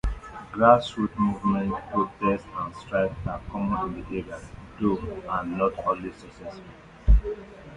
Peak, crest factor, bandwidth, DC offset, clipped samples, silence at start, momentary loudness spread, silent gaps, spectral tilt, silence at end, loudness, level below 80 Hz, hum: -4 dBFS; 22 dB; 9.6 kHz; under 0.1%; under 0.1%; 0.05 s; 18 LU; none; -8 dB/octave; 0 s; -26 LUFS; -32 dBFS; none